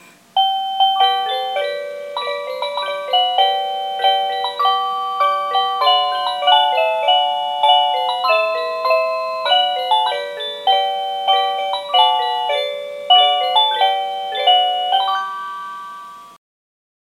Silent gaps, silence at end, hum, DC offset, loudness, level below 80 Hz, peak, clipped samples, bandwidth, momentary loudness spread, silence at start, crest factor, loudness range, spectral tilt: none; 0.75 s; none; under 0.1%; -16 LUFS; -78 dBFS; 0 dBFS; under 0.1%; 14 kHz; 10 LU; 0.35 s; 18 dB; 3 LU; 0 dB/octave